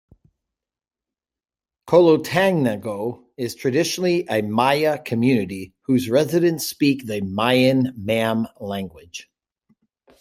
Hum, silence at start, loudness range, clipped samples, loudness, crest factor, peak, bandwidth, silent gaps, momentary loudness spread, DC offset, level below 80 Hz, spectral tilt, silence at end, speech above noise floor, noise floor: none; 1.85 s; 2 LU; under 0.1%; -20 LUFS; 20 dB; -2 dBFS; 16 kHz; none; 14 LU; under 0.1%; -62 dBFS; -5.5 dB/octave; 1 s; over 70 dB; under -90 dBFS